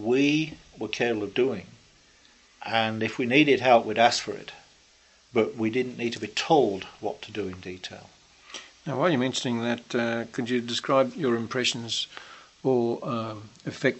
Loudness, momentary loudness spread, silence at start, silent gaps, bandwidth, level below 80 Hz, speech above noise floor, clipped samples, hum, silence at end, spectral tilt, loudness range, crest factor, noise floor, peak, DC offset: -26 LUFS; 17 LU; 0 s; none; 8.4 kHz; -64 dBFS; 33 dB; under 0.1%; none; 0 s; -4.5 dB/octave; 5 LU; 22 dB; -59 dBFS; -4 dBFS; under 0.1%